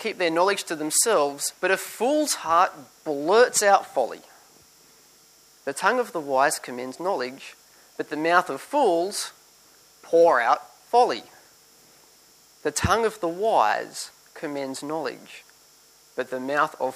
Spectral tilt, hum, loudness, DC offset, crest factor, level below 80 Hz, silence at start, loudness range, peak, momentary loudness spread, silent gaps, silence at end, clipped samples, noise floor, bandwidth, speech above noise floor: -2.5 dB/octave; none; -23 LUFS; under 0.1%; 22 dB; -56 dBFS; 0 s; 5 LU; -4 dBFS; 16 LU; none; 0 s; under 0.1%; -55 dBFS; 15.5 kHz; 32 dB